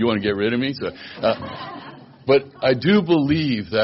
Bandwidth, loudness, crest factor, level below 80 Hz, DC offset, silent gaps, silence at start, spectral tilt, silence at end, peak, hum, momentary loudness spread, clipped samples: 5.8 kHz; -20 LUFS; 14 dB; -54 dBFS; under 0.1%; none; 0 s; -4.5 dB/octave; 0 s; -6 dBFS; none; 16 LU; under 0.1%